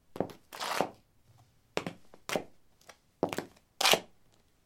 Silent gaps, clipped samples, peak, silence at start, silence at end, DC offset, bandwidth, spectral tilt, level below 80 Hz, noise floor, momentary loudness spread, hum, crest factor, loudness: none; under 0.1%; -4 dBFS; 0.15 s; 0.6 s; under 0.1%; 16.5 kHz; -2 dB/octave; -70 dBFS; -67 dBFS; 19 LU; none; 34 dB; -33 LUFS